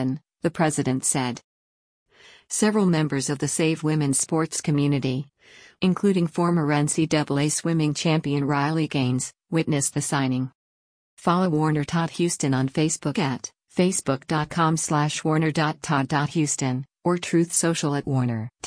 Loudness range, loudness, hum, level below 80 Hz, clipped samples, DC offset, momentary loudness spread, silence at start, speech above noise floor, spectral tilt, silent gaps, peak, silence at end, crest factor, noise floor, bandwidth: 2 LU; -23 LUFS; none; -60 dBFS; under 0.1%; under 0.1%; 6 LU; 0 s; over 67 dB; -5 dB/octave; 1.44-2.06 s, 10.55-11.17 s; -8 dBFS; 0.15 s; 16 dB; under -90 dBFS; 10.5 kHz